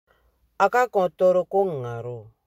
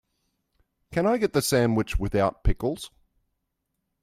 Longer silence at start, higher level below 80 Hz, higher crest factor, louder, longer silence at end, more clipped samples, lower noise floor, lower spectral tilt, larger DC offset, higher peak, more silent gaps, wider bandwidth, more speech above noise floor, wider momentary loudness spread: second, 0.6 s vs 0.9 s; second, -64 dBFS vs -36 dBFS; about the same, 18 dB vs 18 dB; first, -22 LUFS vs -25 LUFS; second, 0.25 s vs 1.15 s; neither; second, -64 dBFS vs -79 dBFS; about the same, -6.5 dB/octave vs -5.5 dB/octave; neither; first, -4 dBFS vs -8 dBFS; neither; about the same, 15 kHz vs 16 kHz; second, 42 dB vs 56 dB; first, 13 LU vs 9 LU